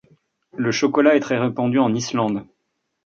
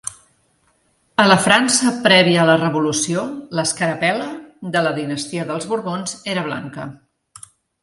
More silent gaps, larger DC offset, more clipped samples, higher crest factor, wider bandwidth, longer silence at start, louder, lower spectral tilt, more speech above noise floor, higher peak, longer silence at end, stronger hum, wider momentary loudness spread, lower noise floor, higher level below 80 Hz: neither; neither; neither; about the same, 18 dB vs 20 dB; second, 7.6 kHz vs 11.5 kHz; first, 0.55 s vs 0.05 s; second, -20 LUFS vs -17 LUFS; first, -5.5 dB/octave vs -3.5 dB/octave; first, 56 dB vs 44 dB; about the same, -2 dBFS vs 0 dBFS; second, 0.65 s vs 0.9 s; neither; second, 9 LU vs 15 LU; first, -74 dBFS vs -62 dBFS; about the same, -64 dBFS vs -60 dBFS